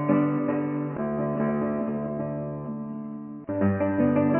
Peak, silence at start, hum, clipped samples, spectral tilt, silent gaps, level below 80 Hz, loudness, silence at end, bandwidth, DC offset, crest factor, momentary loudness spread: -10 dBFS; 0 s; none; under 0.1%; -9.5 dB/octave; none; -52 dBFS; -27 LUFS; 0 s; 3.2 kHz; under 0.1%; 16 dB; 11 LU